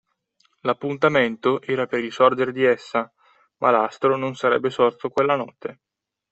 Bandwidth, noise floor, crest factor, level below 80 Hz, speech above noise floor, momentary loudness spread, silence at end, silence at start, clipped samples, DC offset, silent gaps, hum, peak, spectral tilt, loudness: 8.2 kHz; -66 dBFS; 18 dB; -66 dBFS; 45 dB; 8 LU; 0.6 s; 0.65 s; under 0.1%; under 0.1%; none; none; -4 dBFS; -6 dB/octave; -21 LUFS